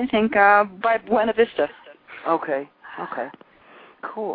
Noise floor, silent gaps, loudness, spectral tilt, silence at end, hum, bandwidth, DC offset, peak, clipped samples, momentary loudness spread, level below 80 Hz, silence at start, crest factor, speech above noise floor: -49 dBFS; none; -21 LUFS; -8.5 dB/octave; 0 s; none; 4.9 kHz; under 0.1%; -2 dBFS; under 0.1%; 19 LU; -60 dBFS; 0 s; 20 dB; 28 dB